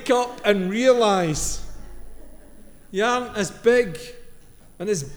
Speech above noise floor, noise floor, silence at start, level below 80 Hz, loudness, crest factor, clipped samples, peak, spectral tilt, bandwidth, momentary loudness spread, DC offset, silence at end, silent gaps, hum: 24 dB; -45 dBFS; 0 s; -42 dBFS; -21 LUFS; 18 dB; under 0.1%; -4 dBFS; -4 dB/octave; over 20 kHz; 16 LU; under 0.1%; 0 s; none; none